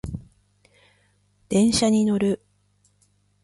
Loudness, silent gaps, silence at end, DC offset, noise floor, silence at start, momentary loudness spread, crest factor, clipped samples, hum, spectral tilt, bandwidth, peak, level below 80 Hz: -21 LUFS; none; 1.1 s; under 0.1%; -64 dBFS; 0.05 s; 16 LU; 16 dB; under 0.1%; 50 Hz at -40 dBFS; -5 dB/octave; 11.5 kHz; -8 dBFS; -48 dBFS